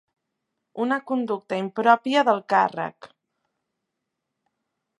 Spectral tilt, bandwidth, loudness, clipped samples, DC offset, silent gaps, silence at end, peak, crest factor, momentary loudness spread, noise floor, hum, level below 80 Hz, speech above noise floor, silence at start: -5.5 dB/octave; 11 kHz; -23 LUFS; under 0.1%; under 0.1%; none; 1.95 s; -4 dBFS; 22 dB; 12 LU; -82 dBFS; none; -80 dBFS; 59 dB; 0.75 s